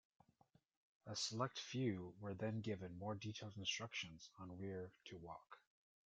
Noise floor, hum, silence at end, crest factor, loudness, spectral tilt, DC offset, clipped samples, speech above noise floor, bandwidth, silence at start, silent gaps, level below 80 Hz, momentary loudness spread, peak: -77 dBFS; none; 0.5 s; 22 dB; -48 LUFS; -4.5 dB/octave; under 0.1%; under 0.1%; 29 dB; 8.8 kHz; 1.05 s; none; -80 dBFS; 13 LU; -28 dBFS